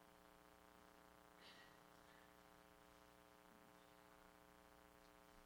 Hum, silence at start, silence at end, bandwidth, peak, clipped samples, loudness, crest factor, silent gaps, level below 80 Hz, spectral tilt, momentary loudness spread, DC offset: none; 0 s; 0 s; over 20 kHz; -50 dBFS; under 0.1%; -68 LUFS; 18 dB; none; -82 dBFS; -3.5 dB/octave; 4 LU; under 0.1%